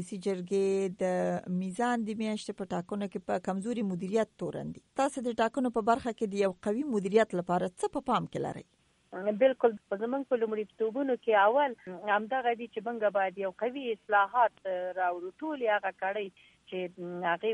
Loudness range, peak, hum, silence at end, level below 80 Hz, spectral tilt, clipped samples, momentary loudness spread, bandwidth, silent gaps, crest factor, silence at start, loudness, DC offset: 4 LU; -12 dBFS; none; 0 s; -70 dBFS; -6 dB/octave; under 0.1%; 10 LU; 11.5 kHz; none; 20 dB; 0 s; -31 LUFS; under 0.1%